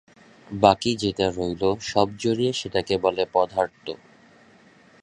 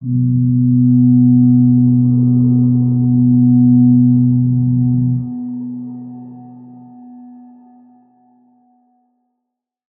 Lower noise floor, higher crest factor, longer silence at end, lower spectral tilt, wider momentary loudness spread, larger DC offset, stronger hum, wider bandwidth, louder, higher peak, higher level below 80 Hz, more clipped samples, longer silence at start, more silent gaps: second, -54 dBFS vs -78 dBFS; first, 24 dB vs 12 dB; second, 1.05 s vs 2.7 s; second, -5 dB/octave vs -18.5 dB/octave; second, 12 LU vs 15 LU; neither; neither; first, 10.5 kHz vs 1.2 kHz; second, -23 LUFS vs -12 LUFS; about the same, -2 dBFS vs -2 dBFS; about the same, -52 dBFS vs -48 dBFS; neither; first, 0.5 s vs 0 s; neither